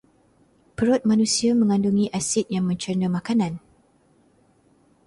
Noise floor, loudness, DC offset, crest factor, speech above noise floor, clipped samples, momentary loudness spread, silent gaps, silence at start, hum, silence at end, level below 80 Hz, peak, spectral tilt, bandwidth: -60 dBFS; -22 LUFS; under 0.1%; 16 dB; 39 dB; under 0.1%; 6 LU; none; 0.8 s; none; 1.5 s; -58 dBFS; -8 dBFS; -5 dB/octave; 11.5 kHz